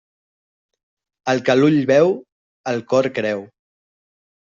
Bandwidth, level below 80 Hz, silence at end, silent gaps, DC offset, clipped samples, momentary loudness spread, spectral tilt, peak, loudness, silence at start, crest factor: 7.6 kHz; -64 dBFS; 1.1 s; 2.32-2.64 s; under 0.1%; under 0.1%; 14 LU; -6.5 dB/octave; -2 dBFS; -18 LUFS; 1.25 s; 18 dB